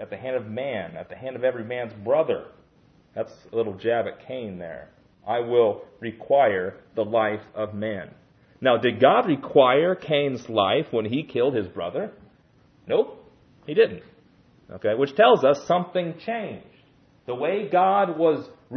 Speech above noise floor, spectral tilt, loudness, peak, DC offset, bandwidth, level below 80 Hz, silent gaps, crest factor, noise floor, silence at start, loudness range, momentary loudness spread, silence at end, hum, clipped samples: 35 dB; -6.5 dB/octave; -23 LUFS; -4 dBFS; under 0.1%; 6.6 kHz; -66 dBFS; none; 20 dB; -58 dBFS; 0 s; 7 LU; 17 LU; 0 s; none; under 0.1%